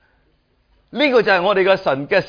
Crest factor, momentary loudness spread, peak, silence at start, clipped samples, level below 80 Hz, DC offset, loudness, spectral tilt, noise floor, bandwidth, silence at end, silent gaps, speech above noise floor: 16 dB; 5 LU; -2 dBFS; 0.95 s; under 0.1%; -56 dBFS; under 0.1%; -16 LUFS; -6 dB/octave; -61 dBFS; 5.2 kHz; 0 s; none; 45 dB